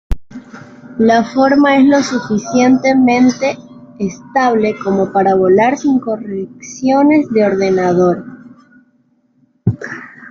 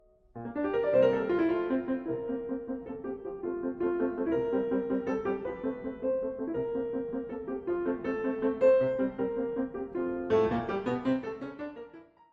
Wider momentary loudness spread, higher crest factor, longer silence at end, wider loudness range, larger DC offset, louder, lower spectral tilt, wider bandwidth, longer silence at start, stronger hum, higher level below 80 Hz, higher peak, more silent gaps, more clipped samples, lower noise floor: first, 17 LU vs 12 LU; second, 12 dB vs 18 dB; second, 0 s vs 0.3 s; about the same, 3 LU vs 4 LU; neither; first, -13 LUFS vs -31 LUFS; second, -6 dB/octave vs -8.5 dB/octave; about the same, 7.4 kHz vs 6.8 kHz; second, 0.1 s vs 0.35 s; neither; first, -34 dBFS vs -60 dBFS; first, -2 dBFS vs -14 dBFS; neither; neither; first, -56 dBFS vs -51 dBFS